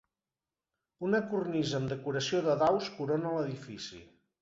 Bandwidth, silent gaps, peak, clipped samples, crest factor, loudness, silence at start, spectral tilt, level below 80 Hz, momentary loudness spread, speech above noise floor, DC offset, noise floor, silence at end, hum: 8 kHz; none; -16 dBFS; under 0.1%; 16 dB; -32 LUFS; 1 s; -5.5 dB/octave; -68 dBFS; 13 LU; over 58 dB; under 0.1%; under -90 dBFS; 0.35 s; none